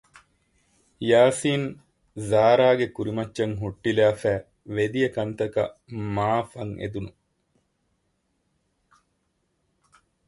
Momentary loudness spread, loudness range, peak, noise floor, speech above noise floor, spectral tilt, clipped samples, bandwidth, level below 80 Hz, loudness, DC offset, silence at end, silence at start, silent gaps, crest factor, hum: 15 LU; 11 LU; -6 dBFS; -73 dBFS; 50 dB; -6 dB/octave; under 0.1%; 11.5 kHz; -56 dBFS; -24 LUFS; under 0.1%; 3.2 s; 1 s; none; 20 dB; none